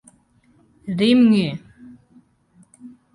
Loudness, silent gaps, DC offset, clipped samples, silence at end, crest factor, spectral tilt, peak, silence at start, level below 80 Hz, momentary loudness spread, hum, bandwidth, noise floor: -17 LUFS; none; under 0.1%; under 0.1%; 0.25 s; 18 dB; -7 dB/octave; -4 dBFS; 0.85 s; -62 dBFS; 22 LU; none; 11.5 kHz; -58 dBFS